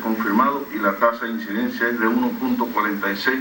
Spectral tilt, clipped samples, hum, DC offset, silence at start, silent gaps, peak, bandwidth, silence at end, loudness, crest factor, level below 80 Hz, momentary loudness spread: -5.5 dB/octave; under 0.1%; none; under 0.1%; 0 s; none; -4 dBFS; 16.5 kHz; 0 s; -21 LUFS; 18 dB; -62 dBFS; 6 LU